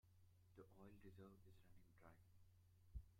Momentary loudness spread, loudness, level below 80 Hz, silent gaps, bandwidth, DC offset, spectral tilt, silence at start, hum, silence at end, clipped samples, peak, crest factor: 5 LU; -66 LUFS; -70 dBFS; none; 16 kHz; under 0.1%; -7.5 dB/octave; 0.05 s; none; 0 s; under 0.1%; -44 dBFS; 22 dB